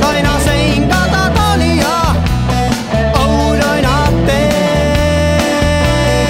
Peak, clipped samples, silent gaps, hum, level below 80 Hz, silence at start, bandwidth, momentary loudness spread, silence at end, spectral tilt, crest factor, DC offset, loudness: 0 dBFS; under 0.1%; none; none; -20 dBFS; 0 s; 16.5 kHz; 2 LU; 0 s; -5.5 dB/octave; 12 dB; 0.3%; -12 LUFS